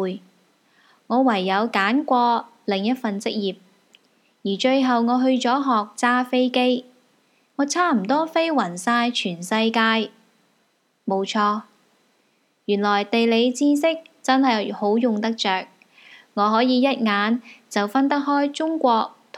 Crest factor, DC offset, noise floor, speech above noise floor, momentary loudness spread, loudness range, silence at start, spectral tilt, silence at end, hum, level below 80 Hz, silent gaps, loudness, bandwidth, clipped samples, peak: 20 dB; under 0.1%; -66 dBFS; 46 dB; 8 LU; 3 LU; 0 s; -4.5 dB/octave; 0 s; none; -86 dBFS; none; -21 LUFS; 13.5 kHz; under 0.1%; -2 dBFS